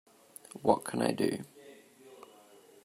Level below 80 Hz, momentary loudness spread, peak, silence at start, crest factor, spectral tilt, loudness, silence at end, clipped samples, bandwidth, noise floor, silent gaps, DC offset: -74 dBFS; 25 LU; -10 dBFS; 0.55 s; 26 dB; -5.5 dB/octave; -32 LUFS; 0.6 s; under 0.1%; 16 kHz; -58 dBFS; none; under 0.1%